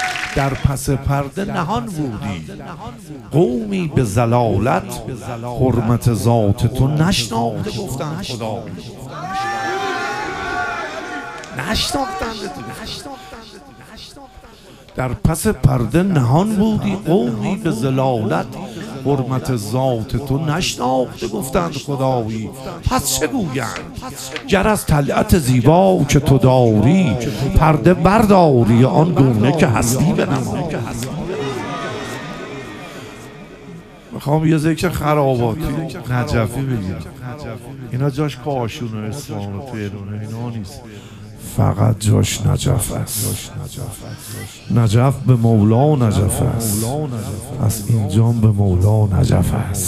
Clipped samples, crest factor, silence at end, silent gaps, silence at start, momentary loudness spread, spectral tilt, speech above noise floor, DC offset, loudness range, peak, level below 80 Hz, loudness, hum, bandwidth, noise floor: under 0.1%; 18 dB; 0 s; none; 0 s; 17 LU; -6 dB/octave; 24 dB; under 0.1%; 11 LU; 0 dBFS; -34 dBFS; -17 LUFS; none; 15.5 kHz; -41 dBFS